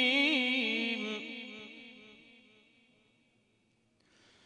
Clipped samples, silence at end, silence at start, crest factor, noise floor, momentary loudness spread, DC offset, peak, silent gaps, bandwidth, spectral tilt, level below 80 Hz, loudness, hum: under 0.1%; 2.3 s; 0 s; 22 dB; -73 dBFS; 24 LU; under 0.1%; -16 dBFS; none; 10.5 kHz; -3 dB/octave; -88 dBFS; -31 LUFS; none